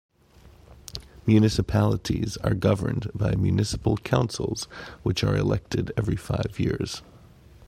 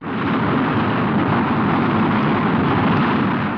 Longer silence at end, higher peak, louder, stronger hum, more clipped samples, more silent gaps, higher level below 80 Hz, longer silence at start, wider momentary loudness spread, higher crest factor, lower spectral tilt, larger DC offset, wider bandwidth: about the same, 0 s vs 0 s; about the same, -4 dBFS vs -6 dBFS; second, -25 LUFS vs -18 LUFS; neither; neither; neither; about the same, -42 dBFS vs -46 dBFS; first, 0.45 s vs 0 s; first, 11 LU vs 2 LU; first, 20 dB vs 12 dB; second, -6.5 dB/octave vs -9 dB/octave; neither; first, 14.5 kHz vs 5.4 kHz